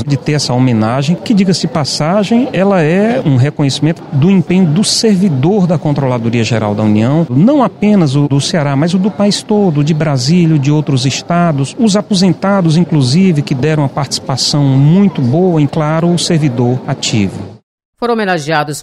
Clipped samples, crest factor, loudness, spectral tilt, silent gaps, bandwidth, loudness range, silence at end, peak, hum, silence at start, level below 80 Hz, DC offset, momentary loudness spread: under 0.1%; 10 dB; -11 LUFS; -6 dB/octave; 17.63-17.78 s, 17.85-17.93 s; 12 kHz; 1 LU; 0 s; 0 dBFS; none; 0 s; -48 dBFS; 0.2%; 5 LU